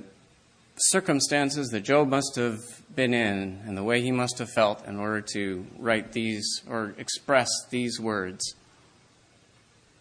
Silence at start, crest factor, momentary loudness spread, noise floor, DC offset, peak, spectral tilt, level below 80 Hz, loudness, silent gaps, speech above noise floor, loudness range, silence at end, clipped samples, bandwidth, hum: 0 s; 22 dB; 10 LU; -60 dBFS; under 0.1%; -6 dBFS; -3.5 dB/octave; -66 dBFS; -27 LUFS; none; 33 dB; 4 LU; 1.5 s; under 0.1%; 11 kHz; none